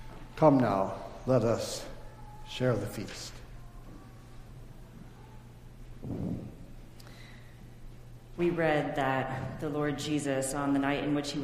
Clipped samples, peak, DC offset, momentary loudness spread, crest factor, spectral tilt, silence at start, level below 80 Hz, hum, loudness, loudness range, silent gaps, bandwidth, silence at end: under 0.1%; -8 dBFS; under 0.1%; 24 LU; 24 dB; -6 dB/octave; 0 s; -50 dBFS; none; -31 LUFS; 14 LU; none; 15.5 kHz; 0 s